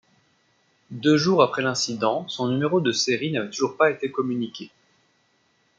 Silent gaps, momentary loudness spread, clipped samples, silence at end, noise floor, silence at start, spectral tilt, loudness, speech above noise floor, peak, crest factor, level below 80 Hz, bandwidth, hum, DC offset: none; 10 LU; under 0.1%; 1.1 s; -66 dBFS; 0.9 s; -4.5 dB/octave; -23 LUFS; 43 dB; -4 dBFS; 20 dB; -70 dBFS; 9.2 kHz; none; under 0.1%